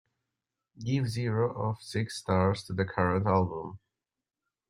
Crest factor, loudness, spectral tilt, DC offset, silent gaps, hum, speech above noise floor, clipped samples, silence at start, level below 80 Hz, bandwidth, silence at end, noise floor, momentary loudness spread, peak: 20 dB; -30 LUFS; -7 dB/octave; under 0.1%; none; none; 61 dB; under 0.1%; 0.75 s; -62 dBFS; 12.5 kHz; 0.9 s; -90 dBFS; 7 LU; -10 dBFS